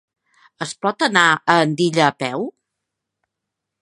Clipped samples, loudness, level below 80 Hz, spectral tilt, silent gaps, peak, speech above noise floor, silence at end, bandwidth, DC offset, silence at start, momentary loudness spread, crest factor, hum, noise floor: under 0.1%; -17 LUFS; -68 dBFS; -4 dB/octave; none; 0 dBFS; 64 dB; 1.3 s; 11.5 kHz; under 0.1%; 0.6 s; 15 LU; 20 dB; none; -81 dBFS